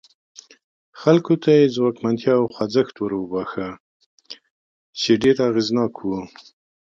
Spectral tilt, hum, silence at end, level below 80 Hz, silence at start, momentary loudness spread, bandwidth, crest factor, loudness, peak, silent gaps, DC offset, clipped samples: -6.5 dB/octave; none; 0.6 s; -60 dBFS; 0.95 s; 21 LU; 7.8 kHz; 18 dB; -20 LUFS; -2 dBFS; 3.80-4.00 s, 4.06-4.18 s, 4.50-4.93 s; under 0.1%; under 0.1%